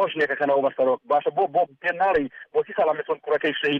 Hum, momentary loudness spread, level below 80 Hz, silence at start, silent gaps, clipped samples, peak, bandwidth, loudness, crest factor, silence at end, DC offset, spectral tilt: none; 5 LU; -62 dBFS; 0 s; none; under 0.1%; -10 dBFS; 6.4 kHz; -23 LUFS; 12 dB; 0 s; under 0.1%; -6.5 dB/octave